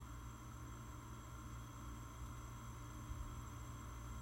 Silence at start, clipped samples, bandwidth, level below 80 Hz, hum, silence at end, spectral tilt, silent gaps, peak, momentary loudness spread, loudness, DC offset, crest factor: 0 s; under 0.1%; 16 kHz; -54 dBFS; none; 0 s; -5 dB/octave; none; -36 dBFS; 3 LU; -53 LUFS; under 0.1%; 16 dB